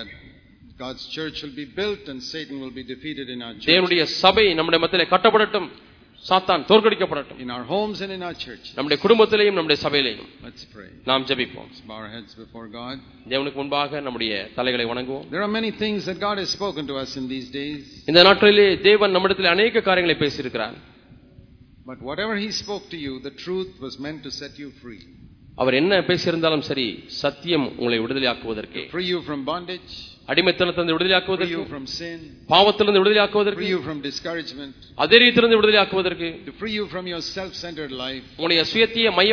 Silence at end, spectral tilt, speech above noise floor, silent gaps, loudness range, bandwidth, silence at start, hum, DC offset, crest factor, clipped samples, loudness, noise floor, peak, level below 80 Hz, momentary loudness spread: 0 s; -4.5 dB/octave; 28 dB; none; 11 LU; 5.4 kHz; 0 s; none; under 0.1%; 22 dB; under 0.1%; -20 LUFS; -49 dBFS; 0 dBFS; -54 dBFS; 18 LU